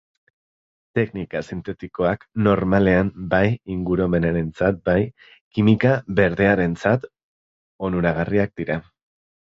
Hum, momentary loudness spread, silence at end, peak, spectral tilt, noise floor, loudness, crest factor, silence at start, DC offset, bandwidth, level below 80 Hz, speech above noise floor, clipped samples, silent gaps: none; 11 LU; 0.7 s; -4 dBFS; -8.5 dB/octave; under -90 dBFS; -21 LUFS; 18 dB; 0.95 s; under 0.1%; 7.6 kHz; -42 dBFS; over 70 dB; under 0.1%; 5.41-5.51 s, 7.23-7.79 s